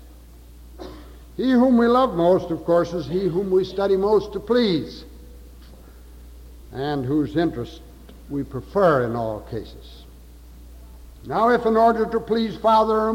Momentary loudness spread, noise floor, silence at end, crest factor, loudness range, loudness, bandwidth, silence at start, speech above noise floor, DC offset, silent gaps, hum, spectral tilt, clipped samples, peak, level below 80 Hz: 19 LU; -44 dBFS; 0 s; 16 dB; 8 LU; -21 LUFS; 16.5 kHz; 0 s; 24 dB; under 0.1%; none; none; -7.5 dB/octave; under 0.1%; -6 dBFS; -44 dBFS